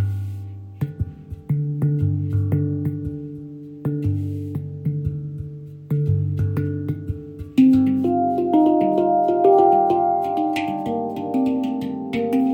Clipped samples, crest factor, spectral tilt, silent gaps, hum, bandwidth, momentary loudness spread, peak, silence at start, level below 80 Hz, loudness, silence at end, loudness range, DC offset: under 0.1%; 18 dB; -10 dB/octave; none; none; 16 kHz; 16 LU; -4 dBFS; 0 s; -46 dBFS; -21 LUFS; 0 s; 8 LU; under 0.1%